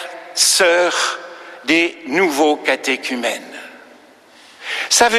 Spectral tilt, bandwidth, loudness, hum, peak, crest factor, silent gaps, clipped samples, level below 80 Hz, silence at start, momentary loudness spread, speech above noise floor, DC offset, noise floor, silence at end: -0.5 dB/octave; 15.5 kHz; -16 LUFS; none; 0 dBFS; 18 dB; none; under 0.1%; -60 dBFS; 0 s; 17 LU; 30 dB; under 0.1%; -46 dBFS; 0 s